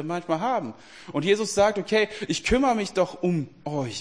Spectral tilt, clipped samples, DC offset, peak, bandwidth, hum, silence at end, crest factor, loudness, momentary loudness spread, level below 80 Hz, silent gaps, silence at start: -4.5 dB/octave; under 0.1%; 0.2%; -8 dBFS; 10.5 kHz; none; 0 s; 18 dB; -25 LUFS; 9 LU; -46 dBFS; none; 0 s